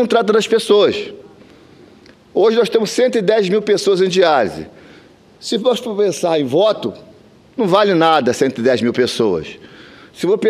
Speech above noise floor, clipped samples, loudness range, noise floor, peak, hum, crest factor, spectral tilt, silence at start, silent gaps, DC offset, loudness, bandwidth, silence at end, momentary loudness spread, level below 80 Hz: 30 dB; under 0.1%; 2 LU; -45 dBFS; 0 dBFS; none; 16 dB; -4.5 dB/octave; 0 s; none; under 0.1%; -15 LUFS; 14 kHz; 0 s; 11 LU; -58 dBFS